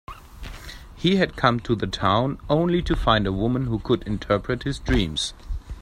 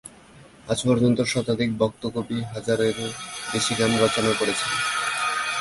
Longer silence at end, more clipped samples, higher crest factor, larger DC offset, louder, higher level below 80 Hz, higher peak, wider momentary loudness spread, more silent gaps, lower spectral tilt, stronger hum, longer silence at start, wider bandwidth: about the same, 0 s vs 0 s; neither; about the same, 22 dB vs 18 dB; neither; about the same, -23 LUFS vs -23 LUFS; first, -34 dBFS vs -54 dBFS; first, -2 dBFS vs -6 dBFS; first, 18 LU vs 9 LU; neither; first, -6 dB/octave vs -4 dB/octave; neither; about the same, 0.1 s vs 0.05 s; first, 15 kHz vs 11.5 kHz